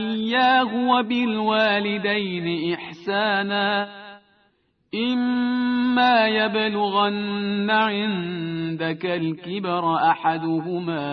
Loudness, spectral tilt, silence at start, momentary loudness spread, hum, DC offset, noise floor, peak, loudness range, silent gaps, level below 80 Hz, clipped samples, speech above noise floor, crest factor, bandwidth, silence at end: -22 LUFS; -7.5 dB/octave; 0 s; 9 LU; none; under 0.1%; -65 dBFS; -6 dBFS; 4 LU; none; -66 dBFS; under 0.1%; 44 dB; 16 dB; 6 kHz; 0 s